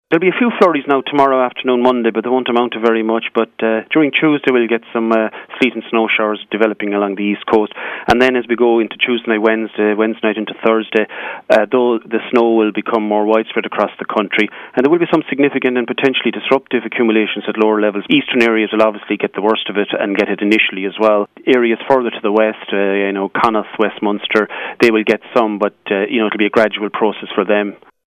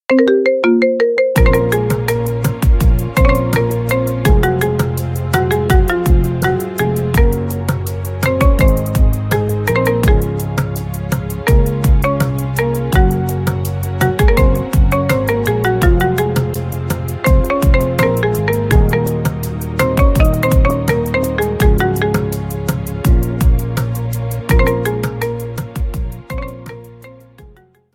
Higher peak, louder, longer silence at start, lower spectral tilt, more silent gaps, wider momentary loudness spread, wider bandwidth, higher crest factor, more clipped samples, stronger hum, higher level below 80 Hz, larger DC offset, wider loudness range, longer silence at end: about the same, 0 dBFS vs 0 dBFS; about the same, -15 LUFS vs -15 LUFS; about the same, 0.1 s vs 0.1 s; about the same, -6 dB/octave vs -6.5 dB/octave; neither; second, 5 LU vs 8 LU; second, 10.5 kHz vs 17 kHz; about the same, 14 dB vs 14 dB; neither; neither; second, -54 dBFS vs -18 dBFS; neither; about the same, 1 LU vs 3 LU; second, 0.3 s vs 0.45 s